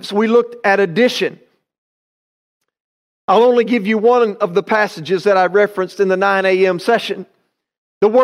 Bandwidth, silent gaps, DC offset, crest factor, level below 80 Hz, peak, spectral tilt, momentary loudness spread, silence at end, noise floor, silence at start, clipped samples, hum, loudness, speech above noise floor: 13.5 kHz; 1.78-2.61 s, 2.80-3.28 s, 7.78-8.01 s; under 0.1%; 14 dB; -68 dBFS; -2 dBFS; -5.5 dB/octave; 6 LU; 0 s; under -90 dBFS; 0.05 s; under 0.1%; none; -15 LUFS; over 76 dB